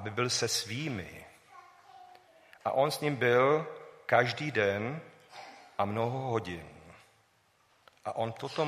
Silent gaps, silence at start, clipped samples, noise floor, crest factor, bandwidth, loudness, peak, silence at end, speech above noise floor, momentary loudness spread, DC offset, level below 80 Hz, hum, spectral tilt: none; 0 s; under 0.1%; -69 dBFS; 22 dB; 15.5 kHz; -31 LUFS; -12 dBFS; 0 s; 38 dB; 19 LU; under 0.1%; -70 dBFS; none; -4 dB/octave